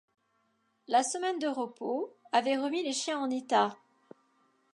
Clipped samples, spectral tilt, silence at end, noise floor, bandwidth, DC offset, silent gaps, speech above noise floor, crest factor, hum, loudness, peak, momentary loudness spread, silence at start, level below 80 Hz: under 0.1%; -2.5 dB/octave; 1 s; -74 dBFS; 11.5 kHz; under 0.1%; none; 44 dB; 20 dB; none; -31 LUFS; -12 dBFS; 7 LU; 0.9 s; -88 dBFS